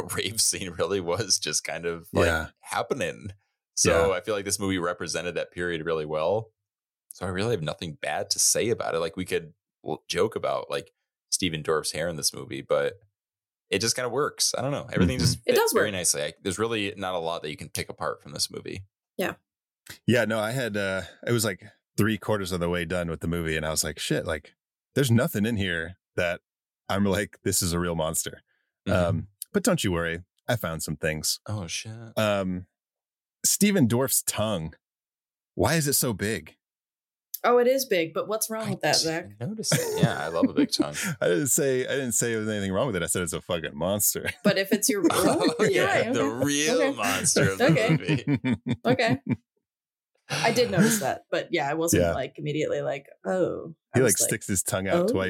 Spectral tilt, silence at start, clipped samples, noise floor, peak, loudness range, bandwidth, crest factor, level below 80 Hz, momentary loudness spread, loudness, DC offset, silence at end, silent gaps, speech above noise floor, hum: -4 dB/octave; 0 s; under 0.1%; under -90 dBFS; -8 dBFS; 5 LU; 17 kHz; 18 dB; -52 dBFS; 11 LU; -26 LUFS; under 0.1%; 0 s; none; over 64 dB; none